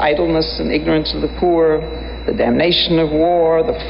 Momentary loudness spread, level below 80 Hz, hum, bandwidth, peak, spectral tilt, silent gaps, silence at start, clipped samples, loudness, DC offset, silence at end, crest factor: 7 LU; -32 dBFS; none; 5.6 kHz; -4 dBFS; -8.5 dB/octave; none; 0 s; under 0.1%; -15 LUFS; under 0.1%; 0 s; 12 dB